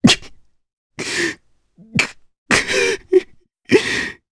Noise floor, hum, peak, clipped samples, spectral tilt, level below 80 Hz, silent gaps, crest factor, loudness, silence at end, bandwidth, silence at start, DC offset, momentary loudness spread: -50 dBFS; none; 0 dBFS; under 0.1%; -3.5 dB/octave; -48 dBFS; 0.73-0.90 s, 2.38-2.46 s; 20 dB; -18 LUFS; 0.2 s; 11 kHz; 0.05 s; under 0.1%; 8 LU